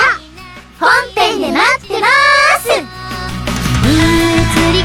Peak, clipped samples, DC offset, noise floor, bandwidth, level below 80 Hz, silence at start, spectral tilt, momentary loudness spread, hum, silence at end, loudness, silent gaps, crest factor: 0 dBFS; under 0.1%; under 0.1%; -34 dBFS; 17.5 kHz; -26 dBFS; 0 s; -4 dB/octave; 12 LU; none; 0 s; -11 LUFS; none; 12 dB